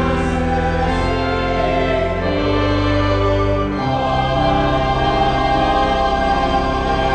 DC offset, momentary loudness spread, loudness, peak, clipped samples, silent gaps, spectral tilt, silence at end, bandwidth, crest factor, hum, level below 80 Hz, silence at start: under 0.1%; 3 LU; -17 LUFS; -4 dBFS; under 0.1%; none; -6.5 dB/octave; 0 s; 9.6 kHz; 12 dB; none; -26 dBFS; 0 s